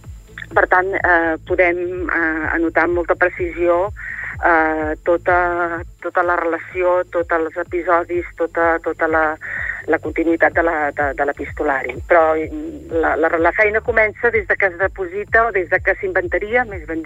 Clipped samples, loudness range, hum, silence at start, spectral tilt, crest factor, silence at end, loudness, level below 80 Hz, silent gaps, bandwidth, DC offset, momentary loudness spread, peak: under 0.1%; 2 LU; none; 0.05 s; -7.5 dB/octave; 16 dB; 0 s; -17 LUFS; -38 dBFS; none; 8 kHz; under 0.1%; 8 LU; -2 dBFS